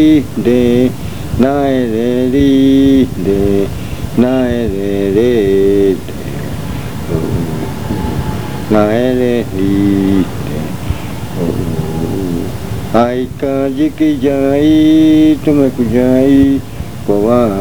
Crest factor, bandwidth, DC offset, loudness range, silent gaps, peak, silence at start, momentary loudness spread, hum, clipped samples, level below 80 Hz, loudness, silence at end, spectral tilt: 12 dB; over 20 kHz; 4%; 6 LU; none; 0 dBFS; 0 s; 12 LU; none; under 0.1%; -30 dBFS; -13 LUFS; 0 s; -7.5 dB/octave